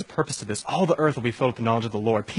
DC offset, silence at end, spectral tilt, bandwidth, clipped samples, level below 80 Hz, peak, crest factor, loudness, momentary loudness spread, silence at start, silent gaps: under 0.1%; 0 s; -5.5 dB/octave; 11 kHz; under 0.1%; -60 dBFS; -6 dBFS; 18 dB; -24 LUFS; 6 LU; 0 s; none